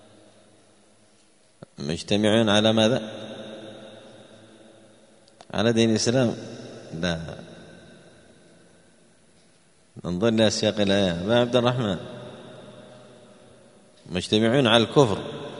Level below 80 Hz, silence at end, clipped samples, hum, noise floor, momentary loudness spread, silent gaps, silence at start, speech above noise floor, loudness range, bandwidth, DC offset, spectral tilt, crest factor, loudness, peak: -58 dBFS; 0 s; under 0.1%; none; -60 dBFS; 23 LU; none; 1.8 s; 38 dB; 8 LU; 10.5 kHz; under 0.1%; -5 dB/octave; 24 dB; -22 LUFS; -2 dBFS